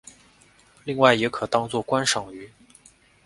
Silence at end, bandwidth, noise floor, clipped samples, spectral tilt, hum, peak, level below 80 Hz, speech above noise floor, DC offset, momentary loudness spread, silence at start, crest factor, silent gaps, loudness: 0.8 s; 11.5 kHz; -56 dBFS; under 0.1%; -3.5 dB/octave; none; 0 dBFS; -60 dBFS; 34 dB; under 0.1%; 20 LU; 0.85 s; 24 dB; none; -22 LUFS